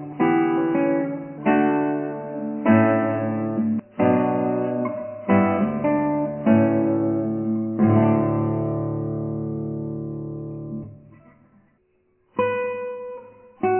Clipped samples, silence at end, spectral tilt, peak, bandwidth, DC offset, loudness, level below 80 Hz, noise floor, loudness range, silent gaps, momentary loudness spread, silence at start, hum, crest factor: under 0.1%; 0 s; -12.5 dB/octave; -4 dBFS; 3.2 kHz; under 0.1%; -22 LUFS; -56 dBFS; -65 dBFS; 10 LU; none; 14 LU; 0 s; none; 18 dB